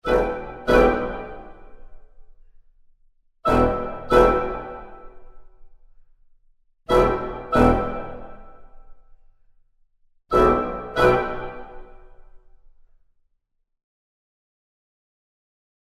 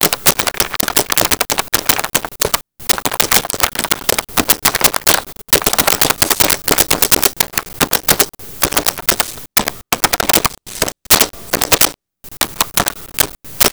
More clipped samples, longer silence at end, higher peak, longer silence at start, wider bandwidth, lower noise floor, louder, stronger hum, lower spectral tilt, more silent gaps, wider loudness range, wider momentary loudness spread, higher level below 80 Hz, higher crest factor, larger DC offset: neither; first, 3.5 s vs 0 s; about the same, -2 dBFS vs 0 dBFS; about the same, 0.05 s vs 0 s; second, 14.5 kHz vs over 20 kHz; first, -71 dBFS vs -37 dBFS; second, -21 LUFS vs -13 LUFS; neither; first, -7 dB/octave vs -1 dB/octave; neither; about the same, 4 LU vs 2 LU; first, 21 LU vs 6 LU; about the same, -36 dBFS vs -36 dBFS; first, 22 dB vs 16 dB; second, under 0.1% vs 0.6%